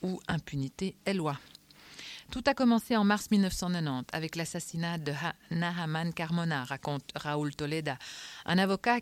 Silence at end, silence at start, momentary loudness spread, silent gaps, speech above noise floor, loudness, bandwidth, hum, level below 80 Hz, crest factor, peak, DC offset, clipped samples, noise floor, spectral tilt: 0 s; 0 s; 12 LU; none; 21 dB; -32 LUFS; 16.5 kHz; none; -56 dBFS; 18 dB; -14 dBFS; under 0.1%; under 0.1%; -53 dBFS; -5.5 dB/octave